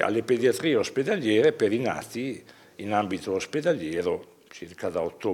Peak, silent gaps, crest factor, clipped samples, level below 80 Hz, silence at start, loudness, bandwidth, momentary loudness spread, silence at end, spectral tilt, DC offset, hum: -6 dBFS; none; 20 dB; under 0.1%; -68 dBFS; 0 s; -26 LUFS; 16.5 kHz; 13 LU; 0 s; -5 dB/octave; under 0.1%; none